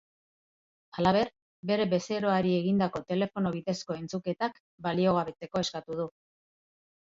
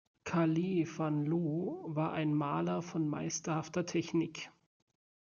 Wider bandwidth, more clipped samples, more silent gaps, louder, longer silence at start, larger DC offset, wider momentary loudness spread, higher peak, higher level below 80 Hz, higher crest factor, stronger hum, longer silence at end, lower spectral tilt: about the same, 7.6 kHz vs 7.2 kHz; neither; first, 1.42-1.63 s, 4.60-4.78 s vs none; first, -30 LUFS vs -35 LUFS; first, 0.95 s vs 0.25 s; neither; first, 9 LU vs 6 LU; first, -10 dBFS vs -18 dBFS; first, -64 dBFS vs -76 dBFS; about the same, 20 dB vs 16 dB; neither; about the same, 0.9 s vs 0.9 s; about the same, -6 dB/octave vs -6 dB/octave